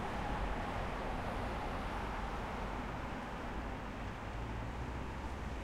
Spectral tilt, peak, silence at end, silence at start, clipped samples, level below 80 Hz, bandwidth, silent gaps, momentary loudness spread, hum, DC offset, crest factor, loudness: -6 dB/octave; -26 dBFS; 0 s; 0 s; under 0.1%; -46 dBFS; 14.5 kHz; none; 4 LU; none; under 0.1%; 14 dB; -42 LUFS